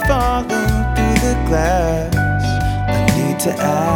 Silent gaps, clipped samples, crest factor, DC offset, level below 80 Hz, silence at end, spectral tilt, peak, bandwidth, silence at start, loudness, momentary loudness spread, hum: none; under 0.1%; 14 dB; under 0.1%; -22 dBFS; 0 s; -5.5 dB/octave; 0 dBFS; 19.5 kHz; 0 s; -17 LUFS; 2 LU; none